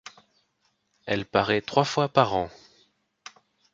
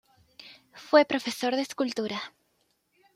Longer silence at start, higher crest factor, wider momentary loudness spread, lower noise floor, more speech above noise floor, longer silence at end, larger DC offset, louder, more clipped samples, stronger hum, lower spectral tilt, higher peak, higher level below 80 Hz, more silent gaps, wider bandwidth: first, 1.05 s vs 0.4 s; about the same, 26 dB vs 22 dB; about the same, 25 LU vs 26 LU; about the same, -72 dBFS vs -72 dBFS; about the same, 48 dB vs 46 dB; first, 1.25 s vs 0.85 s; neither; about the same, -25 LUFS vs -27 LUFS; neither; neither; first, -5 dB/octave vs -3.5 dB/octave; first, -2 dBFS vs -6 dBFS; first, -58 dBFS vs -76 dBFS; neither; second, 7.8 kHz vs 15.5 kHz